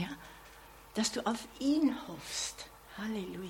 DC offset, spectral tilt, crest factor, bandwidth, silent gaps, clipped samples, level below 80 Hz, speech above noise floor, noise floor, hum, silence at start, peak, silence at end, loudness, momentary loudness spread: under 0.1%; -3.5 dB/octave; 18 dB; 17.5 kHz; none; under 0.1%; -62 dBFS; 20 dB; -55 dBFS; none; 0 s; -18 dBFS; 0 s; -35 LUFS; 21 LU